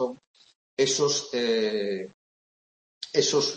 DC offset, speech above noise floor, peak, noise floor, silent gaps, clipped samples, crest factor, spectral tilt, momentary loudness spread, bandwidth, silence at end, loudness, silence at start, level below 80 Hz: under 0.1%; over 65 dB; -8 dBFS; under -90 dBFS; 0.27-0.34 s, 0.55-0.77 s, 2.14-3.01 s; under 0.1%; 20 dB; -2.5 dB/octave; 16 LU; 8.8 kHz; 0 s; -26 LUFS; 0 s; -74 dBFS